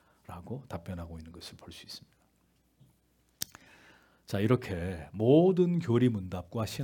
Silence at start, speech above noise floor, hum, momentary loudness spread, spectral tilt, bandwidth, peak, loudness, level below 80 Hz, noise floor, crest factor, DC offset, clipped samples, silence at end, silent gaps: 0.3 s; 41 dB; none; 23 LU; -7 dB/octave; 18 kHz; -12 dBFS; -30 LUFS; -62 dBFS; -70 dBFS; 20 dB; under 0.1%; under 0.1%; 0 s; none